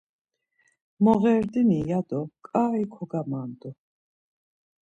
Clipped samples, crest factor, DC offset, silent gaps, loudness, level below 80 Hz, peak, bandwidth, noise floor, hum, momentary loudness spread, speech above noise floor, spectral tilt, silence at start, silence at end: under 0.1%; 20 dB; under 0.1%; none; -25 LUFS; -60 dBFS; -6 dBFS; 7.8 kHz; -70 dBFS; none; 13 LU; 45 dB; -9.5 dB/octave; 1 s; 1.1 s